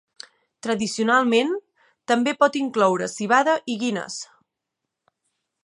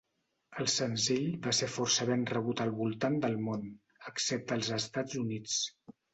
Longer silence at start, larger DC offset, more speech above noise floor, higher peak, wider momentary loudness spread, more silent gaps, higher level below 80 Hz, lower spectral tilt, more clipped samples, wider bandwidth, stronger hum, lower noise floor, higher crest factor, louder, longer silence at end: first, 0.65 s vs 0.5 s; neither; first, 62 dB vs 34 dB; first, -4 dBFS vs -16 dBFS; first, 15 LU vs 8 LU; neither; about the same, -72 dBFS vs -70 dBFS; about the same, -4 dB/octave vs -3.5 dB/octave; neither; first, 11.5 kHz vs 8.4 kHz; neither; first, -83 dBFS vs -67 dBFS; about the same, 20 dB vs 18 dB; first, -21 LUFS vs -33 LUFS; first, 1.4 s vs 0.25 s